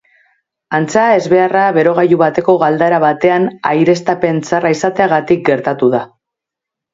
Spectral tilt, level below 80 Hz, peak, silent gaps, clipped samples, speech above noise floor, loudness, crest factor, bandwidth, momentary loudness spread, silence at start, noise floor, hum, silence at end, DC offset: -6.5 dB/octave; -56 dBFS; 0 dBFS; none; under 0.1%; 71 dB; -12 LUFS; 12 dB; 7.8 kHz; 4 LU; 0.7 s; -82 dBFS; none; 0.85 s; under 0.1%